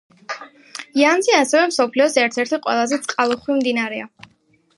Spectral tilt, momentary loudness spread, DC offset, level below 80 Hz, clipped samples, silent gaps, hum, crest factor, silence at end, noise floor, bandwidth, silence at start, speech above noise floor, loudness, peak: -2 dB/octave; 17 LU; under 0.1%; -70 dBFS; under 0.1%; none; none; 18 dB; 0.7 s; -38 dBFS; 11.5 kHz; 0.3 s; 20 dB; -18 LUFS; -2 dBFS